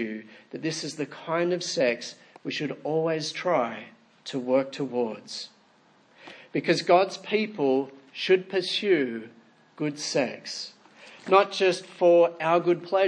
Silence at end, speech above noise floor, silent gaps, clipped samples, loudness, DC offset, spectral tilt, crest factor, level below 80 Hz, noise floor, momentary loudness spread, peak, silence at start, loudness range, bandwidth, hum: 0 s; 35 dB; none; under 0.1%; -26 LUFS; under 0.1%; -4.5 dB/octave; 22 dB; -84 dBFS; -60 dBFS; 16 LU; -4 dBFS; 0 s; 5 LU; 10 kHz; none